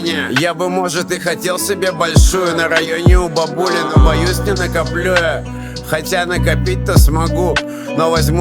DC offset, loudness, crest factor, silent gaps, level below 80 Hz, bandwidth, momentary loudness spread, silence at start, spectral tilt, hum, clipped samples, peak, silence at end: under 0.1%; -15 LUFS; 14 dB; none; -20 dBFS; 19.5 kHz; 6 LU; 0 s; -5 dB/octave; none; under 0.1%; 0 dBFS; 0 s